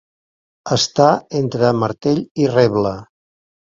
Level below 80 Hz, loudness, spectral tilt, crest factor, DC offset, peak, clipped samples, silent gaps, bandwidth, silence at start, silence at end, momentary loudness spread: -52 dBFS; -17 LUFS; -5.5 dB/octave; 18 dB; under 0.1%; 0 dBFS; under 0.1%; 2.31-2.35 s; 7.8 kHz; 0.65 s; 0.6 s; 8 LU